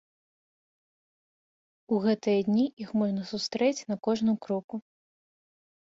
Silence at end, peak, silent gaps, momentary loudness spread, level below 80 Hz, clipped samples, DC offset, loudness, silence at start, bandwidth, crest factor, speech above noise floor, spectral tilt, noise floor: 1.15 s; -14 dBFS; 2.73-2.77 s, 4.64-4.68 s; 8 LU; -72 dBFS; under 0.1%; under 0.1%; -28 LUFS; 1.9 s; 7.8 kHz; 18 dB; over 62 dB; -6 dB/octave; under -90 dBFS